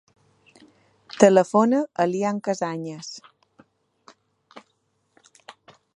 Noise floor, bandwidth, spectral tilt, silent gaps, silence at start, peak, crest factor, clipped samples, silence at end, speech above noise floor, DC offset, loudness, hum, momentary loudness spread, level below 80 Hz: -70 dBFS; 11 kHz; -5.5 dB/octave; none; 1.15 s; 0 dBFS; 24 dB; under 0.1%; 1.4 s; 50 dB; under 0.1%; -21 LUFS; none; 21 LU; -74 dBFS